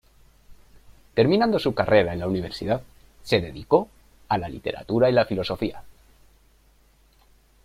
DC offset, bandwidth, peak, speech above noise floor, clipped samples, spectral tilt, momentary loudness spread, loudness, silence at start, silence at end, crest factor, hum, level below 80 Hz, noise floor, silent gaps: under 0.1%; 15 kHz; -4 dBFS; 36 dB; under 0.1%; -7 dB/octave; 11 LU; -23 LUFS; 0.5 s; 1.75 s; 22 dB; none; -50 dBFS; -58 dBFS; none